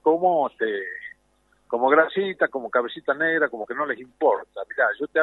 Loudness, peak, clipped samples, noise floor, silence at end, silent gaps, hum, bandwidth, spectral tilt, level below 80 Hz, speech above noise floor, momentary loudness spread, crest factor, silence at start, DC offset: -23 LUFS; -4 dBFS; under 0.1%; -64 dBFS; 0 s; none; none; 4.1 kHz; -7 dB/octave; -70 dBFS; 42 dB; 11 LU; 18 dB; 0.05 s; under 0.1%